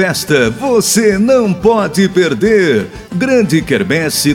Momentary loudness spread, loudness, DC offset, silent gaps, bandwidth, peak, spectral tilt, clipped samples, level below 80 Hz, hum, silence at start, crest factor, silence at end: 3 LU; -12 LUFS; under 0.1%; none; 17.5 kHz; 0 dBFS; -4.5 dB/octave; under 0.1%; -40 dBFS; none; 0 s; 12 dB; 0 s